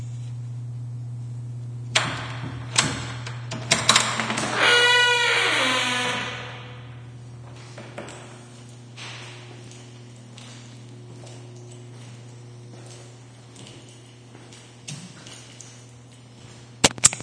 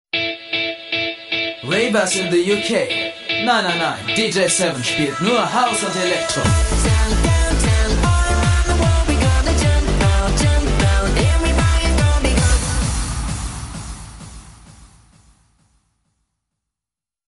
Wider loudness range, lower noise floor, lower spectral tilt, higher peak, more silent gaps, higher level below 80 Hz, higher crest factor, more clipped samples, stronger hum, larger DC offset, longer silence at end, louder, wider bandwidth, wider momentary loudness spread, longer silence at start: first, 23 LU vs 6 LU; second, -46 dBFS vs -89 dBFS; second, -2 dB/octave vs -4.5 dB/octave; about the same, 0 dBFS vs -2 dBFS; neither; second, -58 dBFS vs -22 dBFS; first, 28 dB vs 16 dB; neither; neither; neither; second, 0 s vs 2.45 s; second, -21 LUFS vs -17 LUFS; about the same, 11 kHz vs 11.5 kHz; first, 26 LU vs 5 LU; second, 0 s vs 0.15 s